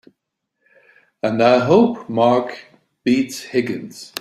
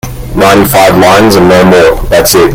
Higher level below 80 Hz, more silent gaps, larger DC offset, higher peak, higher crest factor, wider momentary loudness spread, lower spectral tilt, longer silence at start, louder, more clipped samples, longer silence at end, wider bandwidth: second, -62 dBFS vs -22 dBFS; neither; neither; about the same, -2 dBFS vs 0 dBFS; first, 18 dB vs 4 dB; first, 16 LU vs 4 LU; first, -6 dB/octave vs -4.5 dB/octave; first, 1.25 s vs 0.05 s; second, -17 LUFS vs -4 LUFS; second, under 0.1% vs 8%; about the same, 0 s vs 0 s; second, 14.5 kHz vs over 20 kHz